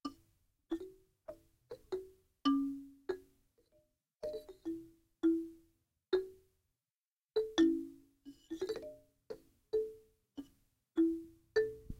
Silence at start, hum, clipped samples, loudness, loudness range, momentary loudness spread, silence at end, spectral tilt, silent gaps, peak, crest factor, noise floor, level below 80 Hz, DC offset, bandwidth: 0.05 s; none; under 0.1%; -38 LUFS; 4 LU; 21 LU; 0.05 s; -5 dB/octave; 6.96-7.17 s, 7.24-7.29 s; -20 dBFS; 20 dB; under -90 dBFS; -66 dBFS; under 0.1%; 12 kHz